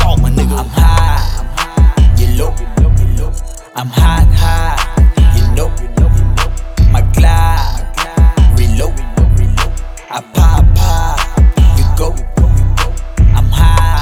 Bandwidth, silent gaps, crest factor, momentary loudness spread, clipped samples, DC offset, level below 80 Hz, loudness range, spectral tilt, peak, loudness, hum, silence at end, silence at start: 16 kHz; none; 8 dB; 9 LU; under 0.1%; under 0.1%; -10 dBFS; 1 LU; -6 dB/octave; 0 dBFS; -12 LUFS; none; 0 s; 0 s